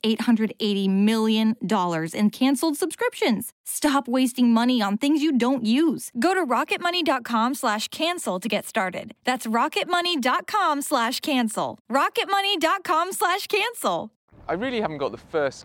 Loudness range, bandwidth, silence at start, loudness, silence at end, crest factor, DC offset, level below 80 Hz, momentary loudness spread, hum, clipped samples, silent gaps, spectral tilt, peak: 3 LU; 17 kHz; 0.05 s; -23 LUFS; 0 s; 14 dB; under 0.1%; -64 dBFS; 6 LU; none; under 0.1%; 3.52-3.64 s, 11.80-11.85 s, 14.16-14.28 s; -4 dB/octave; -10 dBFS